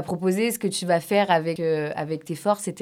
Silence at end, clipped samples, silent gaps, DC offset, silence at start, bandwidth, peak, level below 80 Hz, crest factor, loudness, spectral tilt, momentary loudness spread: 0 s; under 0.1%; none; under 0.1%; 0 s; 18.5 kHz; -6 dBFS; -70 dBFS; 18 dB; -24 LUFS; -5 dB/octave; 7 LU